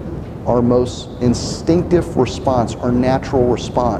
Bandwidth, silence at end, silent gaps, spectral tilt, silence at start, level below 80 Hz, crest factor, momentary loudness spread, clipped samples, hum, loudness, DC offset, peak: 11 kHz; 0 s; none; -6.5 dB/octave; 0 s; -32 dBFS; 14 dB; 5 LU; under 0.1%; none; -17 LUFS; under 0.1%; -2 dBFS